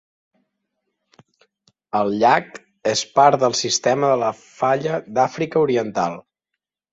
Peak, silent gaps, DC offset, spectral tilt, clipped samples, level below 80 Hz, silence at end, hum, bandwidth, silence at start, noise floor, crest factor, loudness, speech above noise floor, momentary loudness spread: -2 dBFS; none; under 0.1%; -3.5 dB/octave; under 0.1%; -64 dBFS; 0.75 s; none; 8 kHz; 1.95 s; -82 dBFS; 20 dB; -19 LUFS; 64 dB; 10 LU